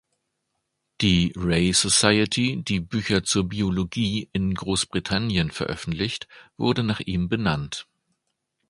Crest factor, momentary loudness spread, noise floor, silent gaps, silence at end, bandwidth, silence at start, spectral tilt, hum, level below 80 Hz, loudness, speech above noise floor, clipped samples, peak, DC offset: 24 dB; 10 LU; -77 dBFS; none; 0.85 s; 11.5 kHz; 1 s; -4 dB/octave; none; -44 dBFS; -23 LUFS; 54 dB; under 0.1%; 0 dBFS; under 0.1%